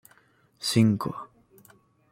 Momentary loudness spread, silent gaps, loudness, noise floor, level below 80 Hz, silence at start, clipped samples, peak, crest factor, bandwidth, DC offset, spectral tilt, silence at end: 20 LU; none; -25 LUFS; -62 dBFS; -66 dBFS; 0.6 s; under 0.1%; -8 dBFS; 20 dB; 16.5 kHz; under 0.1%; -5.5 dB/octave; 0.85 s